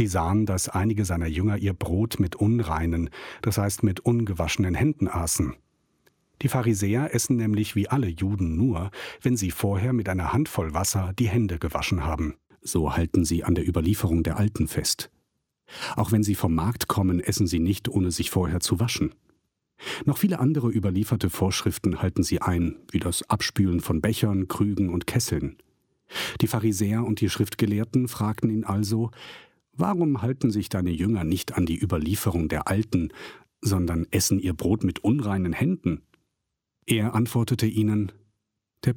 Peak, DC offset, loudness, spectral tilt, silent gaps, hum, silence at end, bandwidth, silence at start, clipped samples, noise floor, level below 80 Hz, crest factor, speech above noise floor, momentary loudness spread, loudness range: -10 dBFS; under 0.1%; -25 LUFS; -5.5 dB/octave; none; none; 0 s; 17.5 kHz; 0 s; under 0.1%; -82 dBFS; -42 dBFS; 14 dB; 58 dB; 6 LU; 1 LU